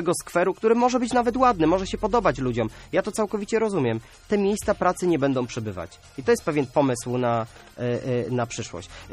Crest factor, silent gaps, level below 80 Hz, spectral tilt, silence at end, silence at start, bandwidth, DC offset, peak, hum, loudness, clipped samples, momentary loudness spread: 18 dB; none; -48 dBFS; -5.5 dB/octave; 0 s; 0 s; 14 kHz; under 0.1%; -6 dBFS; none; -24 LUFS; under 0.1%; 11 LU